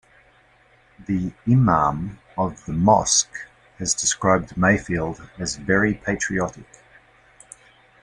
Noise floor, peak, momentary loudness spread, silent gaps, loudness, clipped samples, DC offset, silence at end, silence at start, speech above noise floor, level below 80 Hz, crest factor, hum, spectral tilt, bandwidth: -56 dBFS; -2 dBFS; 13 LU; none; -21 LUFS; under 0.1%; under 0.1%; 1.4 s; 1 s; 35 dB; -46 dBFS; 20 dB; none; -4 dB/octave; 11.5 kHz